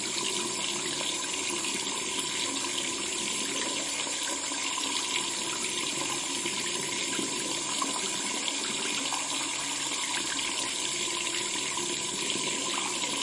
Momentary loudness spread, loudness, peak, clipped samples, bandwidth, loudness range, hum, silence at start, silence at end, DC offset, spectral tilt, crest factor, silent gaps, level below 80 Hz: 1 LU; -29 LUFS; -12 dBFS; under 0.1%; 11.5 kHz; 0 LU; none; 0 s; 0 s; under 0.1%; 0 dB/octave; 20 dB; none; -68 dBFS